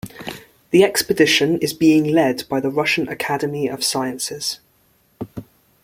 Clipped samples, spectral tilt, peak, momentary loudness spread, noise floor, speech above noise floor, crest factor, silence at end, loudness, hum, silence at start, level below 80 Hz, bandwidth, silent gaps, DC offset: under 0.1%; -4 dB/octave; -2 dBFS; 19 LU; -59 dBFS; 41 dB; 18 dB; 0.4 s; -18 LUFS; none; 0.05 s; -56 dBFS; 16.5 kHz; none; under 0.1%